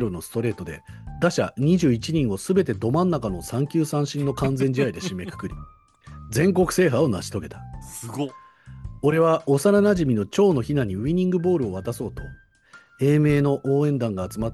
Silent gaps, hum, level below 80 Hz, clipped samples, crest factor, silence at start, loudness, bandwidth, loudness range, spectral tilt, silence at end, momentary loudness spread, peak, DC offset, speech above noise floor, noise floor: none; none; -46 dBFS; under 0.1%; 16 dB; 0 s; -22 LUFS; 12.5 kHz; 4 LU; -6.5 dB/octave; 0 s; 16 LU; -6 dBFS; under 0.1%; 30 dB; -52 dBFS